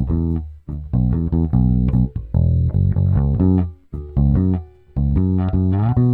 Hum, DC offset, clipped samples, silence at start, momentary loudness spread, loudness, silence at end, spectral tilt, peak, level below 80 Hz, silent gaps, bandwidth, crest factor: none; 0.1%; under 0.1%; 0 s; 9 LU; -19 LUFS; 0 s; -13 dB/octave; -4 dBFS; -26 dBFS; none; 3.9 kHz; 12 dB